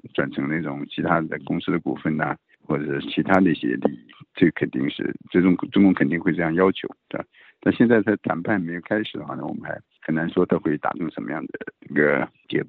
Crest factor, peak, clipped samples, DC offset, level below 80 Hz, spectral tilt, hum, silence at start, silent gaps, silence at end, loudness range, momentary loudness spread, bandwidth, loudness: 22 dB; 0 dBFS; under 0.1%; under 0.1%; -60 dBFS; -9 dB/octave; none; 0.05 s; none; 0 s; 4 LU; 14 LU; 4.6 kHz; -23 LUFS